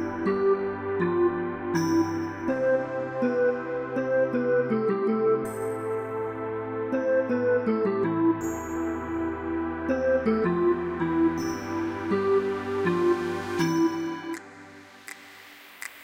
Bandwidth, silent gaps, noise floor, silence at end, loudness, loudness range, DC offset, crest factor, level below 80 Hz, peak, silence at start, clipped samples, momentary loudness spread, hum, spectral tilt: 16 kHz; none; -48 dBFS; 0 s; -26 LUFS; 1 LU; under 0.1%; 14 dB; -56 dBFS; -14 dBFS; 0 s; under 0.1%; 9 LU; none; -6.5 dB/octave